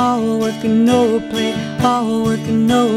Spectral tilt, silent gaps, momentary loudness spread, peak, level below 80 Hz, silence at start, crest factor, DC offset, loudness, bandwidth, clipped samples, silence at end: -6 dB/octave; none; 6 LU; -2 dBFS; -46 dBFS; 0 s; 14 dB; under 0.1%; -16 LUFS; 14.5 kHz; under 0.1%; 0 s